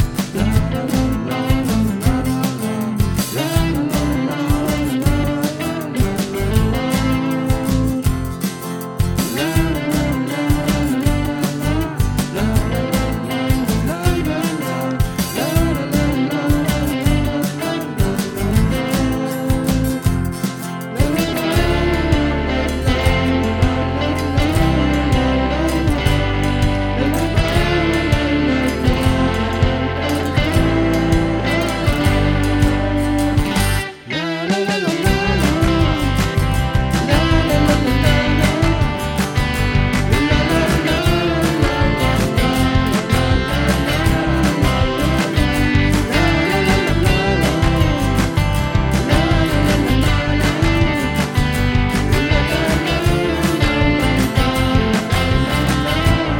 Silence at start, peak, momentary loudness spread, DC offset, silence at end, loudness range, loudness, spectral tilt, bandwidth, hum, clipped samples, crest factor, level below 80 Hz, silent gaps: 0 s; 0 dBFS; 4 LU; under 0.1%; 0 s; 3 LU; -17 LUFS; -5.5 dB/octave; 19.5 kHz; none; under 0.1%; 16 dB; -24 dBFS; none